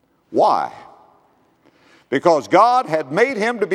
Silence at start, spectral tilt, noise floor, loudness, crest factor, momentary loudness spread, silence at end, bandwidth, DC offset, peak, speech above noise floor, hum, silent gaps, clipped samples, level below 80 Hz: 0.3 s; -5 dB/octave; -57 dBFS; -17 LUFS; 18 dB; 10 LU; 0 s; 12.5 kHz; under 0.1%; 0 dBFS; 41 dB; none; none; under 0.1%; -72 dBFS